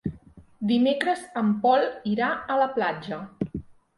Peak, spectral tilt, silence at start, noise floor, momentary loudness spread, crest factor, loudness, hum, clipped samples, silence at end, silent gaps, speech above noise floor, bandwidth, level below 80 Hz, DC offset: -8 dBFS; -6.5 dB/octave; 0.05 s; -50 dBFS; 12 LU; 16 dB; -25 LUFS; none; under 0.1%; 0.35 s; none; 26 dB; 11.5 kHz; -54 dBFS; under 0.1%